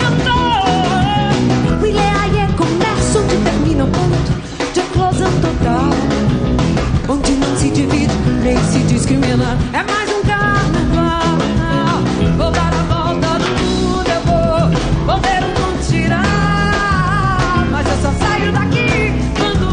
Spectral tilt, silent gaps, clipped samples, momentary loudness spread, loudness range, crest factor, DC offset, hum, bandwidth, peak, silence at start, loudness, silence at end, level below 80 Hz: -5.5 dB/octave; none; under 0.1%; 2 LU; 1 LU; 12 dB; under 0.1%; none; 10 kHz; -2 dBFS; 0 s; -14 LUFS; 0 s; -24 dBFS